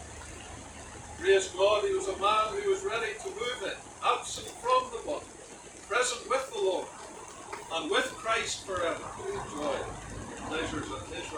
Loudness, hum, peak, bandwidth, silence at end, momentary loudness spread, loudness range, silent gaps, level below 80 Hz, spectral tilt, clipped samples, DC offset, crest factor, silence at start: -31 LUFS; none; -12 dBFS; 18 kHz; 0 s; 18 LU; 4 LU; none; -56 dBFS; -2.5 dB/octave; under 0.1%; under 0.1%; 20 dB; 0 s